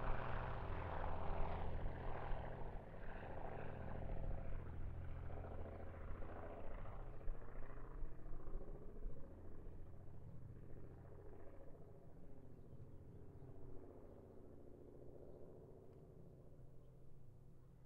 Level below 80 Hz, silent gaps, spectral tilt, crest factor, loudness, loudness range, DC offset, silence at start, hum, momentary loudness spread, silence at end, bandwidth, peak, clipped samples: -52 dBFS; none; -7 dB/octave; 18 dB; -54 LUFS; 11 LU; under 0.1%; 0 s; none; 15 LU; 0 s; 4.1 kHz; -28 dBFS; under 0.1%